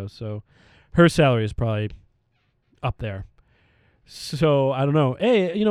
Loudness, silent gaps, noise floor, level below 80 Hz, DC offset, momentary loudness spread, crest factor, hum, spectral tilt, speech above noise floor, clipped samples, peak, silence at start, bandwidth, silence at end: -21 LUFS; none; -68 dBFS; -44 dBFS; under 0.1%; 16 LU; 22 dB; none; -7 dB/octave; 47 dB; under 0.1%; -2 dBFS; 0 s; 13 kHz; 0 s